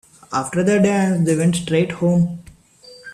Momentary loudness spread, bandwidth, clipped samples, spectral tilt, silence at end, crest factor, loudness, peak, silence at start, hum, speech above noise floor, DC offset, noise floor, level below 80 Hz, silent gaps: 8 LU; 13 kHz; under 0.1%; -6.5 dB/octave; 0 s; 14 dB; -18 LUFS; -4 dBFS; 0.3 s; none; 29 dB; under 0.1%; -46 dBFS; -52 dBFS; none